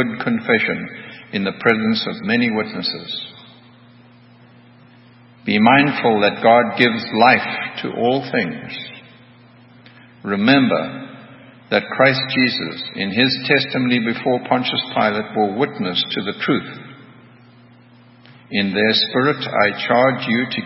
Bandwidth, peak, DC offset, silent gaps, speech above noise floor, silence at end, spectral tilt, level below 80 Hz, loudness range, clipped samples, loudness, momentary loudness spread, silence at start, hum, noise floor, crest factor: 5.8 kHz; 0 dBFS; under 0.1%; none; 29 dB; 0 s; -8 dB/octave; -64 dBFS; 7 LU; under 0.1%; -17 LUFS; 14 LU; 0 s; none; -47 dBFS; 20 dB